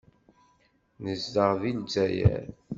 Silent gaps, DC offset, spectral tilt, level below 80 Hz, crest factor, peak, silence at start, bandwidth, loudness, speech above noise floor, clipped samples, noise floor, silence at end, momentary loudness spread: none; under 0.1%; -7 dB/octave; -46 dBFS; 22 dB; -8 dBFS; 1 s; 7.6 kHz; -27 LUFS; 40 dB; under 0.1%; -67 dBFS; 0 s; 11 LU